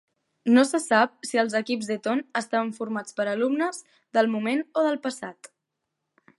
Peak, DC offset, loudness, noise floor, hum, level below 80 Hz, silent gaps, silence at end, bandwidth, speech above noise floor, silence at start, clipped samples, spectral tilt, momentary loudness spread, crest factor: -6 dBFS; under 0.1%; -25 LUFS; -82 dBFS; none; -80 dBFS; none; 1.05 s; 11.5 kHz; 57 dB; 0.45 s; under 0.1%; -4 dB/octave; 11 LU; 20 dB